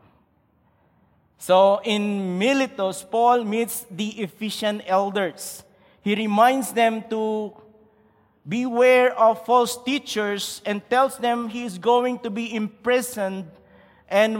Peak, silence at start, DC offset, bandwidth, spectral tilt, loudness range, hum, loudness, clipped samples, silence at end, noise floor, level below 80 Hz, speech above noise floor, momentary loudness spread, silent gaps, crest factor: -4 dBFS; 1.4 s; under 0.1%; 17 kHz; -4 dB/octave; 3 LU; none; -22 LUFS; under 0.1%; 0 s; -63 dBFS; -70 dBFS; 41 dB; 12 LU; none; 18 dB